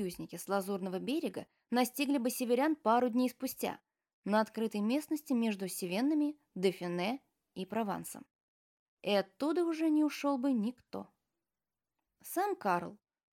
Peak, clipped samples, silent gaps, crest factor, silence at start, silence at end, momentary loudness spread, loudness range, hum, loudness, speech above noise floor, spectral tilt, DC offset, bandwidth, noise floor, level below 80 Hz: -16 dBFS; under 0.1%; 4.13-4.23 s, 8.35-8.97 s; 18 dB; 0 s; 0.35 s; 15 LU; 4 LU; none; -34 LUFS; over 56 dB; -5 dB/octave; under 0.1%; 18 kHz; under -90 dBFS; -80 dBFS